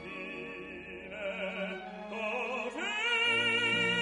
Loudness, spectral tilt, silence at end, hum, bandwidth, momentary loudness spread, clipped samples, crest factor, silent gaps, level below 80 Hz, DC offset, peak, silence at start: -32 LUFS; -3 dB/octave; 0 s; none; 11.5 kHz; 16 LU; under 0.1%; 16 dB; none; -66 dBFS; under 0.1%; -18 dBFS; 0 s